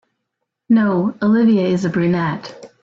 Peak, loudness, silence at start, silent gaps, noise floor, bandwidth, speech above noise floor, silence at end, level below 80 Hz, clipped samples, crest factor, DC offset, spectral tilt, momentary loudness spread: -6 dBFS; -16 LUFS; 0.7 s; none; -77 dBFS; 7.6 kHz; 61 dB; 0.15 s; -56 dBFS; under 0.1%; 12 dB; under 0.1%; -8 dB/octave; 9 LU